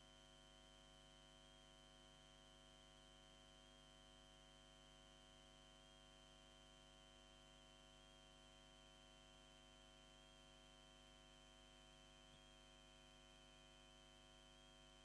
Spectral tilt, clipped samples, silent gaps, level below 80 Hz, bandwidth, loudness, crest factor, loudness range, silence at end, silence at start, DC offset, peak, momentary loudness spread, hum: -3 dB/octave; under 0.1%; none; -74 dBFS; 11 kHz; -66 LUFS; 16 dB; 0 LU; 0 s; 0 s; under 0.1%; -50 dBFS; 0 LU; 50 Hz at -75 dBFS